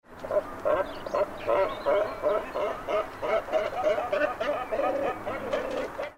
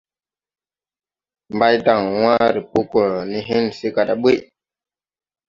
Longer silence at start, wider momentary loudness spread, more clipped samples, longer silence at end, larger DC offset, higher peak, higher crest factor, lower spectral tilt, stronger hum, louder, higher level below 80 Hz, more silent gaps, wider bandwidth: second, 0.1 s vs 1.5 s; about the same, 5 LU vs 6 LU; neither; second, 0.05 s vs 1.05 s; neither; second, -14 dBFS vs -2 dBFS; about the same, 14 dB vs 18 dB; second, -5 dB/octave vs -6.5 dB/octave; neither; second, -29 LUFS vs -18 LUFS; about the same, -52 dBFS vs -56 dBFS; neither; first, 16 kHz vs 7.4 kHz